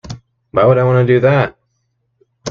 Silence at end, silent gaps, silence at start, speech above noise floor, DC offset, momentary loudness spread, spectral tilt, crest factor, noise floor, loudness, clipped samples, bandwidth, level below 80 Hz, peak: 0 s; none; 0.05 s; 55 dB; under 0.1%; 20 LU; -7.5 dB/octave; 14 dB; -66 dBFS; -13 LUFS; under 0.1%; 6.8 kHz; -48 dBFS; 0 dBFS